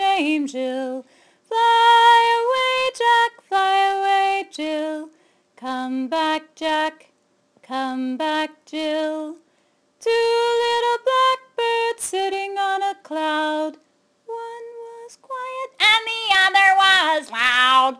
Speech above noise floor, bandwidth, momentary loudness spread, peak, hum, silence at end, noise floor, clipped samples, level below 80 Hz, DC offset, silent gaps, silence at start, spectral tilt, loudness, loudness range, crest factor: 40 dB; 13.5 kHz; 17 LU; -2 dBFS; none; 0.05 s; -63 dBFS; under 0.1%; -66 dBFS; under 0.1%; none; 0 s; -1 dB/octave; -19 LUFS; 9 LU; 18 dB